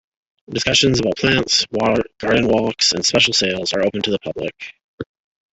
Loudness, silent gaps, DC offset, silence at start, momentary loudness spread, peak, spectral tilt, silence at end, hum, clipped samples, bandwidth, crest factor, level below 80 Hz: -17 LUFS; 4.84-4.98 s; under 0.1%; 0.5 s; 21 LU; -2 dBFS; -3 dB/octave; 0.5 s; none; under 0.1%; 8.4 kHz; 18 dB; -46 dBFS